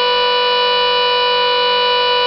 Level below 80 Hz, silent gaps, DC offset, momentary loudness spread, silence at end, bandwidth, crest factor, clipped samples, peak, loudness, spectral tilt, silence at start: -52 dBFS; none; under 0.1%; 0 LU; 0 s; 6 kHz; 6 dB; under 0.1%; -8 dBFS; -13 LUFS; -3.5 dB/octave; 0 s